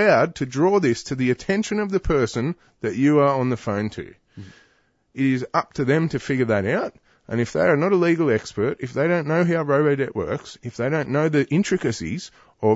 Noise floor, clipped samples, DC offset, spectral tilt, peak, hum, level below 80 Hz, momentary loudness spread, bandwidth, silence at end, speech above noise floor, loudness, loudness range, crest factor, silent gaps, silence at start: -63 dBFS; under 0.1%; under 0.1%; -6.5 dB/octave; -4 dBFS; none; -46 dBFS; 11 LU; 8 kHz; 0 s; 42 dB; -22 LUFS; 3 LU; 16 dB; none; 0 s